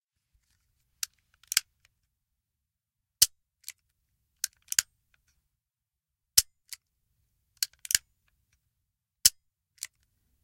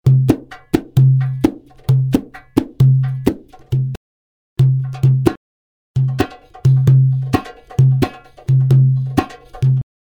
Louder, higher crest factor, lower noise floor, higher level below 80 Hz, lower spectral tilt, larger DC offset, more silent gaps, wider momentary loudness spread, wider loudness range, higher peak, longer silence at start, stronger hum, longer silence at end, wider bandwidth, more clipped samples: second, -27 LUFS vs -16 LUFS; first, 32 dB vs 16 dB; about the same, -89 dBFS vs under -90 dBFS; second, -66 dBFS vs -40 dBFS; second, 3.5 dB/octave vs -8.5 dB/octave; neither; second, none vs 3.97-4.56 s, 5.37-5.94 s; first, 23 LU vs 11 LU; about the same, 1 LU vs 3 LU; about the same, -2 dBFS vs 0 dBFS; first, 1.55 s vs 0.05 s; neither; first, 1.15 s vs 0.25 s; first, 16.5 kHz vs 7 kHz; neither